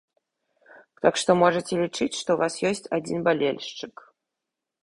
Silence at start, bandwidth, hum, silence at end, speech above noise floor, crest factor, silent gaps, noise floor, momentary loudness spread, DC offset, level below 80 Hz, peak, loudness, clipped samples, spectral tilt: 1.05 s; 11.5 kHz; none; 0.95 s; 61 dB; 22 dB; none; -85 dBFS; 13 LU; under 0.1%; -64 dBFS; -4 dBFS; -24 LUFS; under 0.1%; -4.5 dB/octave